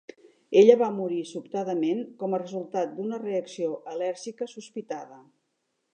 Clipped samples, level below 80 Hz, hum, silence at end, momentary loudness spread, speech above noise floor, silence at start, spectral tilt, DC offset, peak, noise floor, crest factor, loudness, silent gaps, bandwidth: under 0.1%; -86 dBFS; none; 0.75 s; 18 LU; 51 dB; 0.5 s; -6 dB/octave; under 0.1%; -4 dBFS; -77 dBFS; 24 dB; -26 LUFS; none; 9.4 kHz